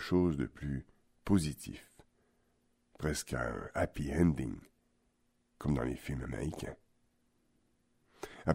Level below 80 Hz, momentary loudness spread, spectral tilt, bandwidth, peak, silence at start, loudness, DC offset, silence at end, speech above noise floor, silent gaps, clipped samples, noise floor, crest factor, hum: -50 dBFS; 17 LU; -6.5 dB/octave; 16 kHz; -16 dBFS; 0 s; -36 LUFS; under 0.1%; 0 s; 41 dB; none; under 0.1%; -76 dBFS; 22 dB; none